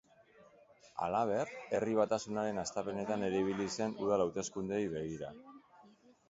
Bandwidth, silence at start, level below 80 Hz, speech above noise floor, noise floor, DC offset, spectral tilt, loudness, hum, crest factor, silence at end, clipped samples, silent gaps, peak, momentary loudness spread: 7.6 kHz; 0.4 s; -68 dBFS; 28 dB; -63 dBFS; under 0.1%; -5 dB/octave; -36 LUFS; none; 20 dB; 0.4 s; under 0.1%; none; -18 dBFS; 8 LU